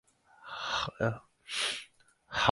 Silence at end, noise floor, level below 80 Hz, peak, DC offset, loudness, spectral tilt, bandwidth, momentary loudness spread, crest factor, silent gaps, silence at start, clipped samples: 0 s; -60 dBFS; -60 dBFS; -6 dBFS; under 0.1%; -34 LUFS; -3 dB/octave; 11.5 kHz; 15 LU; 28 dB; none; 0.4 s; under 0.1%